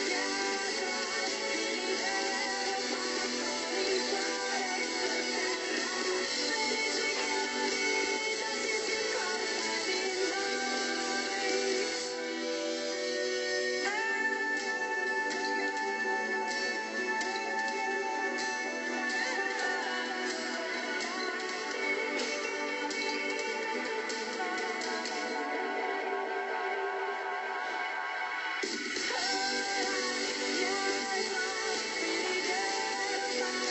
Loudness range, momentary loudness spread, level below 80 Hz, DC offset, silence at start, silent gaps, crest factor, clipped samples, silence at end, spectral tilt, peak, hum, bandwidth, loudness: 3 LU; 4 LU; -74 dBFS; under 0.1%; 0 s; none; 16 dB; under 0.1%; 0 s; 0 dB/octave; -18 dBFS; none; 8.6 kHz; -32 LUFS